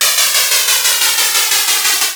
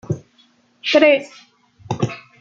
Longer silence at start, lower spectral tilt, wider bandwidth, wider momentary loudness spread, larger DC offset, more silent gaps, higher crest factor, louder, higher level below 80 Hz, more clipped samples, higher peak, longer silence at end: about the same, 0 s vs 0.1 s; second, 3.5 dB/octave vs -5.5 dB/octave; first, over 20 kHz vs 7.6 kHz; second, 1 LU vs 16 LU; neither; neither; second, 12 dB vs 18 dB; first, -10 LUFS vs -18 LUFS; about the same, -60 dBFS vs -60 dBFS; neither; about the same, 0 dBFS vs -2 dBFS; second, 0 s vs 0.2 s